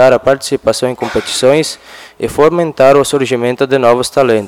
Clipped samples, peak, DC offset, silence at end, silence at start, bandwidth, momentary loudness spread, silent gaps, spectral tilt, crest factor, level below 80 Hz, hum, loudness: 1%; 0 dBFS; under 0.1%; 0 s; 0 s; 17 kHz; 9 LU; none; -4.5 dB/octave; 10 dB; -44 dBFS; none; -11 LUFS